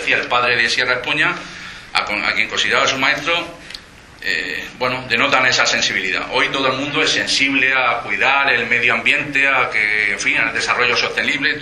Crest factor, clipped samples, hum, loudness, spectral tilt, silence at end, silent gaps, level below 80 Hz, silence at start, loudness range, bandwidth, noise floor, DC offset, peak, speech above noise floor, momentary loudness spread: 18 dB; under 0.1%; none; -15 LUFS; -2 dB/octave; 0 s; none; -50 dBFS; 0 s; 4 LU; 13 kHz; -38 dBFS; under 0.1%; 0 dBFS; 20 dB; 8 LU